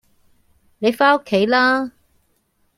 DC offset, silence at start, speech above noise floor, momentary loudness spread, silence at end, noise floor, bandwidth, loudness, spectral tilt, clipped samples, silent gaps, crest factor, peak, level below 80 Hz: under 0.1%; 0.8 s; 48 dB; 7 LU; 0.9 s; -64 dBFS; 15.5 kHz; -17 LUFS; -5 dB/octave; under 0.1%; none; 18 dB; -2 dBFS; -62 dBFS